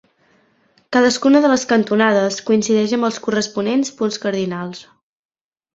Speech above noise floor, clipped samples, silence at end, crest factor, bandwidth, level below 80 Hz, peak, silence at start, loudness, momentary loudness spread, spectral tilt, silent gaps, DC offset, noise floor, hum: 42 dB; under 0.1%; 0.9 s; 16 dB; 8 kHz; -60 dBFS; -2 dBFS; 0.9 s; -17 LUFS; 9 LU; -4.5 dB/octave; none; under 0.1%; -58 dBFS; none